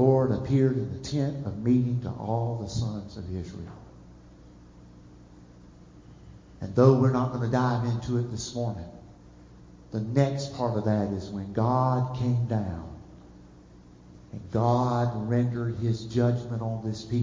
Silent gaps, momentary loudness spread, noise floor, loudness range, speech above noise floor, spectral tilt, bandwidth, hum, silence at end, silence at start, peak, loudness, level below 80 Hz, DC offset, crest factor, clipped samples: none; 13 LU; -51 dBFS; 9 LU; 25 dB; -8 dB/octave; 7.6 kHz; 60 Hz at -50 dBFS; 0 s; 0 s; -6 dBFS; -27 LUFS; -50 dBFS; under 0.1%; 22 dB; under 0.1%